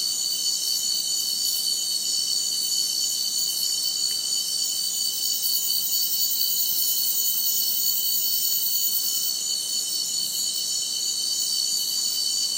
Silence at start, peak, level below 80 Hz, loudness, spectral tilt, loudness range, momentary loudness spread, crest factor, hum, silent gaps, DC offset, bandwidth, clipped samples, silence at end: 0 s; -8 dBFS; -84 dBFS; -21 LUFS; 2.5 dB/octave; 2 LU; 3 LU; 16 dB; none; none; under 0.1%; 16 kHz; under 0.1%; 0 s